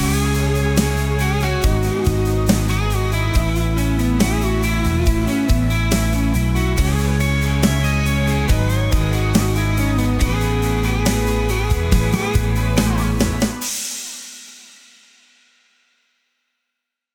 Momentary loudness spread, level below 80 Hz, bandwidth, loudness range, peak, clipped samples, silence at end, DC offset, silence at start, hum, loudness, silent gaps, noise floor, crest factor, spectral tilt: 2 LU; -22 dBFS; 19 kHz; 5 LU; 0 dBFS; under 0.1%; 2.5 s; under 0.1%; 0 s; none; -18 LUFS; none; -80 dBFS; 18 dB; -5.5 dB/octave